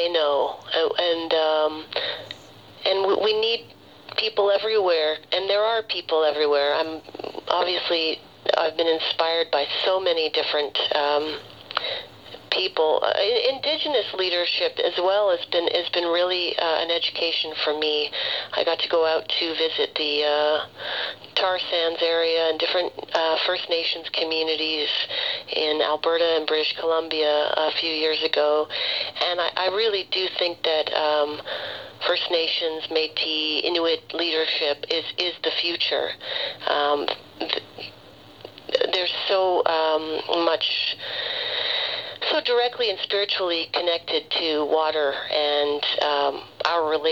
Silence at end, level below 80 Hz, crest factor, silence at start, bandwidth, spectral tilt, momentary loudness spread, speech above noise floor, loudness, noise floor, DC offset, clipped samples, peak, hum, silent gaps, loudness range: 0 s; -70 dBFS; 20 dB; 0 s; 7.4 kHz; -3.5 dB/octave; 6 LU; 22 dB; -23 LUFS; -46 dBFS; under 0.1%; under 0.1%; -2 dBFS; none; none; 2 LU